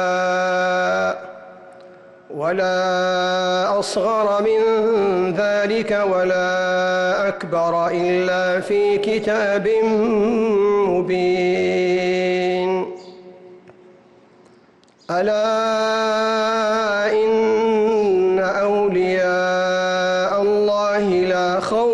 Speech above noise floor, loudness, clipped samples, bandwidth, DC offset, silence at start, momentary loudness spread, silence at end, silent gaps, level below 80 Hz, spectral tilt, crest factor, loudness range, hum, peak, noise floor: 34 dB; -18 LUFS; under 0.1%; 11.5 kHz; under 0.1%; 0 s; 3 LU; 0 s; none; -56 dBFS; -5 dB/octave; 8 dB; 4 LU; none; -10 dBFS; -52 dBFS